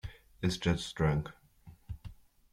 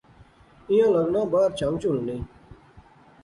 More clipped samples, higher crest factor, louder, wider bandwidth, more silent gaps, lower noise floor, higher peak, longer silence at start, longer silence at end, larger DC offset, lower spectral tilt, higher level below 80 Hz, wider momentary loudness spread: neither; first, 22 dB vs 14 dB; second, -33 LUFS vs -23 LUFS; first, 13.5 kHz vs 11 kHz; neither; first, -58 dBFS vs -53 dBFS; second, -14 dBFS vs -10 dBFS; second, 0.05 s vs 0.7 s; about the same, 0.4 s vs 0.45 s; neither; about the same, -6 dB/octave vs -7 dB/octave; about the same, -50 dBFS vs -52 dBFS; first, 18 LU vs 13 LU